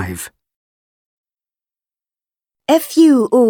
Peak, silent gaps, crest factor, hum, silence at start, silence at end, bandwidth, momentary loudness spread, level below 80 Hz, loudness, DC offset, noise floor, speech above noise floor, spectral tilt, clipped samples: -2 dBFS; 0.56-1.24 s; 16 dB; none; 0 s; 0 s; 19 kHz; 18 LU; -54 dBFS; -12 LUFS; under 0.1%; under -90 dBFS; over 78 dB; -5 dB/octave; under 0.1%